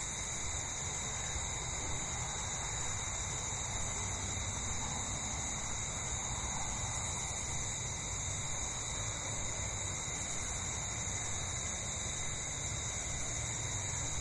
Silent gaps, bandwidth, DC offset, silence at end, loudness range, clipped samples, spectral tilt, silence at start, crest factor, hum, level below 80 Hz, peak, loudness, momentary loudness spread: none; 11.5 kHz; under 0.1%; 0 s; 0 LU; under 0.1%; -2 dB/octave; 0 s; 14 dB; none; -48 dBFS; -24 dBFS; -37 LUFS; 1 LU